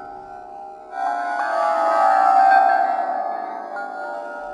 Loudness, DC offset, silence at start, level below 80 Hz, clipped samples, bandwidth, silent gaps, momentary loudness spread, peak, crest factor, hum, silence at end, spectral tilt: -19 LUFS; under 0.1%; 0 s; -68 dBFS; under 0.1%; 11 kHz; none; 22 LU; -4 dBFS; 16 dB; none; 0 s; -2.5 dB/octave